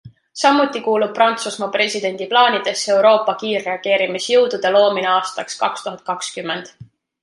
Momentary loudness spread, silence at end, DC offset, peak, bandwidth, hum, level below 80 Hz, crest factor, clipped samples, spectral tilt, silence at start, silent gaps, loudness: 11 LU; 0.4 s; under 0.1%; -2 dBFS; 11.5 kHz; none; -68 dBFS; 16 dB; under 0.1%; -2.5 dB/octave; 0.05 s; none; -17 LUFS